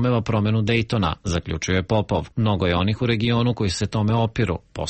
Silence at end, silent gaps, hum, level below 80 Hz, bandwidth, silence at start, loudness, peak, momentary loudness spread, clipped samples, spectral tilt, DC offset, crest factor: 0 s; none; none; -40 dBFS; 8.6 kHz; 0 s; -22 LUFS; -8 dBFS; 5 LU; under 0.1%; -6 dB/octave; under 0.1%; 14 dB